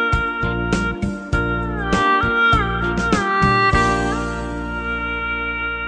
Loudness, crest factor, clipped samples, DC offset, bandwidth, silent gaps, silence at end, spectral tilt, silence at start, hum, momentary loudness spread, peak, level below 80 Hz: -19 LUFS; 16 dB; under 0.1%; under 0.1%; 10 kHz; none; 0 s; -5.5 dB/octave; 0 s; none; 9 LU; -4 dBFS; -30 dBFS